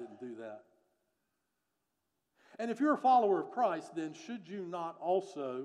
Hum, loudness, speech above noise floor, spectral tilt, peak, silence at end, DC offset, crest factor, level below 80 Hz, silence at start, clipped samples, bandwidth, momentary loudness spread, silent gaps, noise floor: none; -33 LUFS; 51 dB; -6 dB/octave; -16 dBFS; 0 s; under 0.1%; 18 dB; under -90 dBFS; 0 s; under 0.1%; 10.5 kHz; 19 LU; none; -85 dBFS